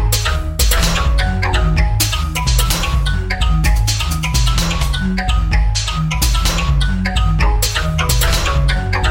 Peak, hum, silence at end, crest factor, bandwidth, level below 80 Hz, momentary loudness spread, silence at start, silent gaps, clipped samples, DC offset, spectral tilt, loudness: 0 dBFS; none; 0 s; 14 dB; 17 kHz; -16 dBFS; 3 LU; 0 s; none; under 0.1%; under 0.1%; -3.5 dB/octave; -16 LUFS